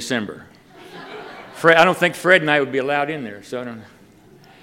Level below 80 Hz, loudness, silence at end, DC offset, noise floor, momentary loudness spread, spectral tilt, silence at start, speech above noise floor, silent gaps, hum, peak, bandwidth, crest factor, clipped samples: -64 dBFS; -17 LUFS; 0.8 s; under 0.1%; -48 dBFS; 23 LU; -4.5 dB/octave; 0 s; 30 dB; none; none; 0 dBFS; 16.5 kHz; 20 dB; under 0.1%